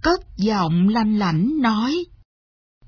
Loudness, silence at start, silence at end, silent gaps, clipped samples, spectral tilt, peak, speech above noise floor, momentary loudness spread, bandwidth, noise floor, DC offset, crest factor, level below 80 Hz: -20 LUFS; 0 s; 0.8 s; none; under 0.1%; -7 dB/octave; -4 dBFS; over 71 dB; 6 LU; 5.4 kHz; under -90 dBFS; under 0.1%; 16 dB; -44 dBFS